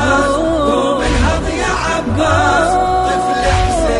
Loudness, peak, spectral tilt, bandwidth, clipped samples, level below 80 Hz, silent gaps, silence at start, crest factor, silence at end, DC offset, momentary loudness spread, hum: -14 LUFS; -2 dBFS; -5 dB/octave; 11.5 kHz; under 0.1%; -24 dBFS; none; 0 s; 12 dB; 0 s; 0.3%; 4 LU; none